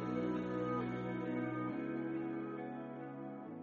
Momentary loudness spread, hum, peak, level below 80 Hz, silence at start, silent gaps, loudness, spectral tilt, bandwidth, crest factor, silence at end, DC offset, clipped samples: 9 LU; none; -26 dBFS; -70 dBFS; 0 s; none; -41 LUFS; -7 dB/octave; 7 kHz; 14 dB; 0 s; under 0.1%; under 0.1%